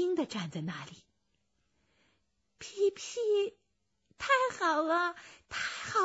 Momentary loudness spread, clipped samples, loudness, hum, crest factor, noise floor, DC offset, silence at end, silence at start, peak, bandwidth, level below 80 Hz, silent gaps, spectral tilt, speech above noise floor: 16 LU; under 0.1%; -32 LUFS; none; 18 dB; -79 dBFS; under 0.1%; 0 s; 0 s; -16 dBFS; 8 kHz; -72 dBFS; none; -4 dB/octave; 46 dB